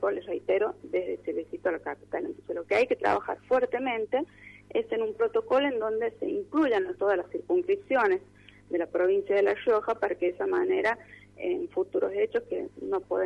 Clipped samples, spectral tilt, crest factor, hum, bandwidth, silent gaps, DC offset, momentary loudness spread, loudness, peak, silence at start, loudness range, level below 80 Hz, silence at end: under 0.1%; -6 dB/octave; 16 dB; 50 Hz at -60 dBFS; 8.6 kHz; none; under 0.1%; 9 LU; -29 LUFS; -12 dBFS; 0 s; 2 LU; -66 dBFS; 0 s